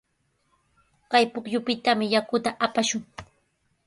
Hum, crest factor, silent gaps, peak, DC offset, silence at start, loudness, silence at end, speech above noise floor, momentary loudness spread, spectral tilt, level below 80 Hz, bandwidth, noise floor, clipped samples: none; 22 dB; none; -6 dBFS; under 0.1%; 1.1 s; -24 LUFS; 0.6 s; 47 dB; 9 LU; -3 dB/octave; -64 dBFS; 11.5 kHz; -71 dBFS; under 0.1%